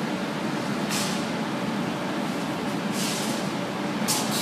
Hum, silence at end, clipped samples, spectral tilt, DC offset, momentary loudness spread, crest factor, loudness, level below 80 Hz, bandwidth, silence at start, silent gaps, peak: none; 0 s; under 0.1%; -4 dB/octave; under 0.1%; 4 LU; 18 dB; -27 LUFS; -66 dBFS; 15.5 kHz; 0 s; none; -10 dBFS